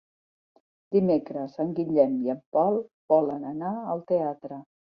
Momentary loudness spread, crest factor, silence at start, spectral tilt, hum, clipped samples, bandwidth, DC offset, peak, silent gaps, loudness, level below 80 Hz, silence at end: 9 LU; 18 dB; 0.9 s; -11 dB/octave; none; under 0.1%; 5.6 kHz; under 0.1%; -8 dBFS; 2.46-2.52 s, 2.94-3.08 s; -26 LUFS; -70 dBFS; 0.35 s